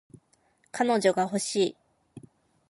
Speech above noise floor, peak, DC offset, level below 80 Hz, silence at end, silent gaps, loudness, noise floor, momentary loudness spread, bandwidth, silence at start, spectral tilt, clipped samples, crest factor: 42 dB; -8 dBFS; under 0.1%; -74 dBFS; 0.5 s; none; -26 LUFS; -67 dBFS; 6 LU; 11.5 kHz; 0.75 s; -4 dB/octave; under 0.1%; 20 dB